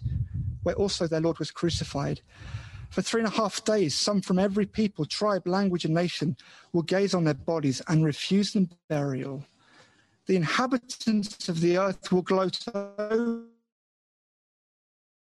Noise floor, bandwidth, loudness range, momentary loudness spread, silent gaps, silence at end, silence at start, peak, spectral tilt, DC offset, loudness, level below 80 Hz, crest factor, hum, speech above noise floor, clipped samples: -60 dBFS; 12 kHz; 3 LU; 9 LU; 8.84-8.88 s; 1.85 s; 0 s; -12 dBFS; -5.5 dB/octave; under 0.1%; -27 LUFS; -50 dBFS; 16 dB; none; 33 dB; under 0.1%